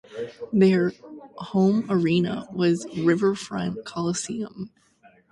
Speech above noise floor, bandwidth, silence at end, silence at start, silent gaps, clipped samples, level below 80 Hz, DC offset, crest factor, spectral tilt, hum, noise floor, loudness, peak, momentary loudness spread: 34 dB; 11.5 kHz; 0.65 s; 0.1 s; none; under 0.1%; -62 dBFS; under 0.1%; 16 dB; -6 dB/octave; none; -57 dBFS; -24 LUFS; -8 dBFS; 17 LU